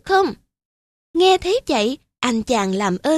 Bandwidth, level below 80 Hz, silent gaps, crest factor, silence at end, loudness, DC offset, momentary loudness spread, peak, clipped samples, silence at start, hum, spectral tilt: 13 kHz; -48 dBFS; 0.65-1.14 s; 18 dB; 0 s; -19 LUFS; under 0.1%; 8 LU; -2 dBFS; under 0.1%; 0.05 s; none; -4 dB/octave